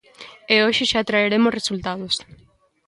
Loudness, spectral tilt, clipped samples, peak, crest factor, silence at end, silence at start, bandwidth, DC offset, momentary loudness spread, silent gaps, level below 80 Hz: -19 LUFS; -3.5 dB/octave; under 0.1%; -4 dBFS; 18 dB; 0.55 s; 0.2 s; 11.5 kHz; under 0.1%; 9 LU; none; -54 dBFS